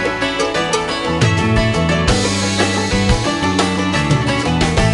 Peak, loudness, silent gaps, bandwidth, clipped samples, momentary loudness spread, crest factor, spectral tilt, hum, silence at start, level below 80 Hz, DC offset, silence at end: -2 dBFS; -16 LUFS; none; 11.5 kHz; under 0.1%; 3 LU; 14 dB; -4.5 dB/octave; none; 0 s; -26 dBFS; under 0.1%; 0 s